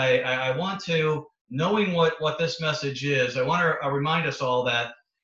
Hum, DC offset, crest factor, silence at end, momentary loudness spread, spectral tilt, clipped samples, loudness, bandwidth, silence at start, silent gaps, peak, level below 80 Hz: none; under 0.1%; 16 dB; 0.3 s; 5 LU; -5 dB/octave; under 0.1%; -25 LUFS; 7.6 kHz; 0 s; 1.41-1.45 s; -10 dBFS; -64 dBFS